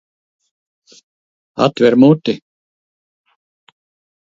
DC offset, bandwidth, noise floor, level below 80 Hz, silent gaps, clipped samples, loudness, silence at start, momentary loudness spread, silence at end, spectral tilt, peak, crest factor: under 0.1%; 7.6 kHz; under -90 dBFS; -62 dBFS; none; under 0.1%; -13 LUFS; 1.55 s; 16 LU; 1.85 s; -7.5 dB/octave; 0 dBFS; 18 dB